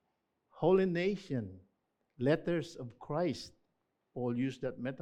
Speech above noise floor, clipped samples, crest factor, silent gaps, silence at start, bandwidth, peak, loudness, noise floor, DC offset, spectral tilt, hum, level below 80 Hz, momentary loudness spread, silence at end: 48 dB; under 0.1%; 18 dB; none; 0.55 s; 10 kHz; -16 dBFS; -34 LUFS; -82 dBFS; under 0.1%; -7.5 dB/octave; none; -66 dBFS; 17 LU; 0 s